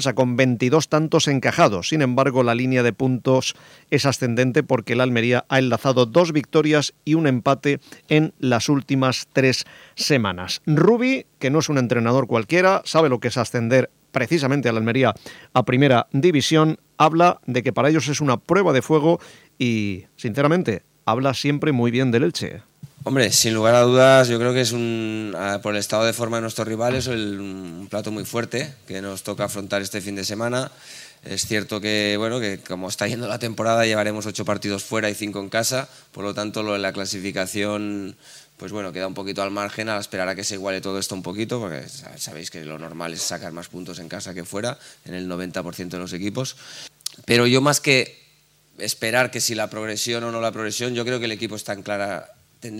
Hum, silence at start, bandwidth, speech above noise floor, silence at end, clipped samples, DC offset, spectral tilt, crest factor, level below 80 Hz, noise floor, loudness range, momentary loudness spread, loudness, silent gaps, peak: none; 0 s; 16.5 kHz; 37 dB; 0 s; under 0.1%; under 0.1%; -4.5 dB/octave; 20 dB; -62 dBFS; -58 dBFS; 9 LU; 14 LU; -21 LUFS; none; 0 dBFS